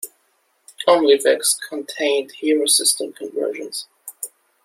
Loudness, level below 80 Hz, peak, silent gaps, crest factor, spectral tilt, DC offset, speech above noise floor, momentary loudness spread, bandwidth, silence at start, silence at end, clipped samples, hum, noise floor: -18 LUFS; -76 dBFS; -2 dBFS; none; 18 dB; -0.5 dB/octave; under 0.1%; 46 dB; 18 LU; 16.5 kHz; 0 s; 0.35 s; under 0.1%; none; -64 dBFS